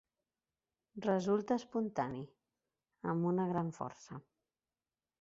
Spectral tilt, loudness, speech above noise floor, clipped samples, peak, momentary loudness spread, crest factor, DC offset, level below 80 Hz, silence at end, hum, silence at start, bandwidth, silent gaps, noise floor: -7.5 dB/octave; -37 LUFS; over 54 dB; under 0.1%; -20 dBFS; 18 LU; 20 dB; under 0.1%; -74 dBFS; 1 s; none; 0.95 s; 7.6 kHz; none; under -90 dBFS